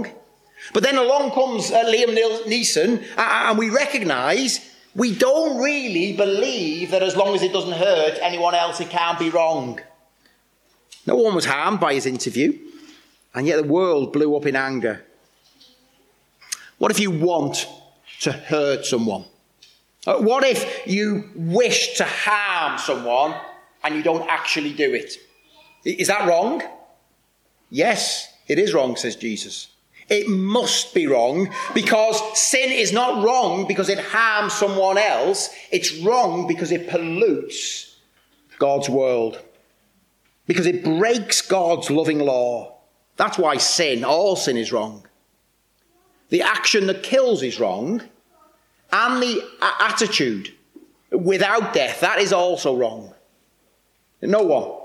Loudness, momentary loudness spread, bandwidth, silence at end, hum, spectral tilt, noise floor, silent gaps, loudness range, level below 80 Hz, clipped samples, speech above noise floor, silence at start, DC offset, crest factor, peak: -20 LUFS; 10 LU; 15.5 kHz; 0 s; none; -3 dB/octave; -64 dBFS; none; 5 LU; -72 dBFS; under 0.1%; 45 dB; 0 s; under 0.1%; 16 dB; -4 dBFS